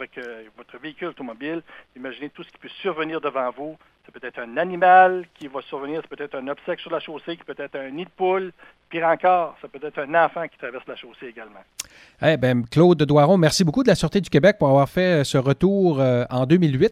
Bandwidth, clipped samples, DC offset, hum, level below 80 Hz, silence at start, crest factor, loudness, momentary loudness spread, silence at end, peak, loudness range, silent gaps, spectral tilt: 15 kHz; under 0.1%; under 0.1%; none; -52 dBFS; 0 s; 18 dB; -20 LUFS; 20 LU; 0 s; -2 dBFS; 12 LU; none; -6 dB/octave